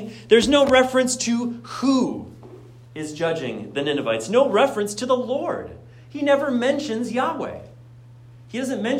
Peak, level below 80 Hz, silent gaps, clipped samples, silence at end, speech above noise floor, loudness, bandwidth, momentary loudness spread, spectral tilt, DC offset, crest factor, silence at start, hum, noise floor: -4 dBFS; -54 dBFS; none; under 0.1%; 0 s; 24 dB; -21 LUFS; 15 kHz; 17 LU; -4 dB/octave; under 0.1%; 18 dB; 0 s; none; -45 dBFS